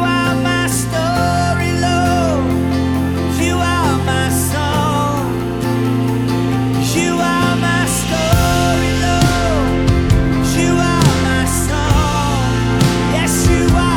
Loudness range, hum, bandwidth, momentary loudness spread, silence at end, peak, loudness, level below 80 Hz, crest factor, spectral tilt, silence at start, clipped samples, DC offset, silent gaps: 2 LU; none; 19.5 kHz; 3 LU; 0 s; 0 dBFS; -15 LUFS; -24 dBFS; 14 dB; -5 dB/octave; 0 s; under 0.1%; under 0.1%; none